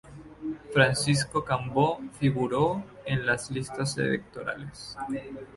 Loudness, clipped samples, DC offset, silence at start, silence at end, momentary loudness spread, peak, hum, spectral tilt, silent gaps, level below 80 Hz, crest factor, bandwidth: -28 LUFS; under 0.1%; under 0.1%; 0.05 s; 0 s; 14 LU; -6 dBFS; none; -5 dB/octave; none; -56 dBFS; 22 dB; 11.5 kHz